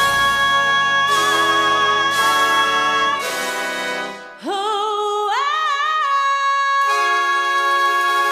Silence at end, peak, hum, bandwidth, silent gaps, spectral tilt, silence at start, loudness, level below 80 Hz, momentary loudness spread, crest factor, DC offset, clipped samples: 0 s; -4 dBFS; none; 16 kHz; none; -1 dB/octave; 0 s; -16 LUFS; -54 dBFS; 7 LU; 14 dB; under 0.1%; under 0.1%